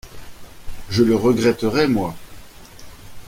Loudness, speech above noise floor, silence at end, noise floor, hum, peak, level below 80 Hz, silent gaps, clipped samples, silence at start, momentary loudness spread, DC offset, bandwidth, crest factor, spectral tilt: -18 LUFS; 22 dB; 0 s; -39 dBFS; none; -4 dBFS; -42 dBFS; none; under 0.1%; 0.05 s; 17 LU; under 0.1%; 16.5 kHz; 18 dB; -6 dB/octave